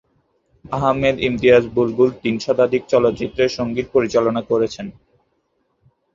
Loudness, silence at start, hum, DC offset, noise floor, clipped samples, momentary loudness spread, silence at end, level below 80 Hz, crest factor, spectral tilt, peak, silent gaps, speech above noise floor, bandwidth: -18 LUFS; 0.7 s; none; under 0.1%; -67 dBFS; under 0.1%; 9 LU; 1.25 s; -48 dBFS; 18 dB; -6 dB/octave; -2 dBFS; none; 50 dB; 7.4 kHz